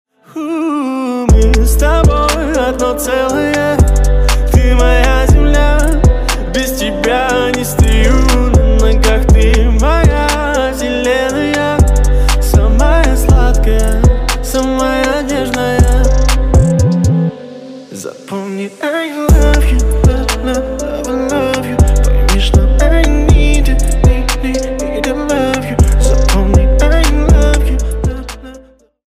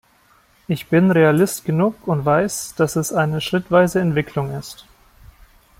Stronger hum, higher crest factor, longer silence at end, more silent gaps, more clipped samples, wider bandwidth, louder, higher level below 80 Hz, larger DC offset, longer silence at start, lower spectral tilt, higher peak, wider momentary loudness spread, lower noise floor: neither; second, 10 dB vs 16 dB; second, 0.5 s vs 1.05 s; neither; neither; about the same, 15.5 kHz vs 16.5 kHz; first, -12 LUFS vs -18 LUFS; first, -12 dBFS vs -50 dBFS; neither; second, 0.35 s vs 0.7 s; about the same, -5.5 dB/octave vs -6 dB/octave; about the same, 0 dBFS vs -2 dBFS; second, 7 LU vs 12 LU; second, -40 dBFS vs -55 dBFS